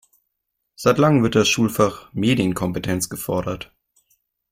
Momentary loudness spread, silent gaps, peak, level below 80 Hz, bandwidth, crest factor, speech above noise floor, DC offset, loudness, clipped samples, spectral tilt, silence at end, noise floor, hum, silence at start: 9 LU; none; -2 dBFS; -50 dBFS; 16.5 kHz; 20 dB; 58 dB; under 0.1%; -20 LUFS; under 0.1%; -5 dB/octave; 0.9 s; -77 dBFS; none; 0.8 s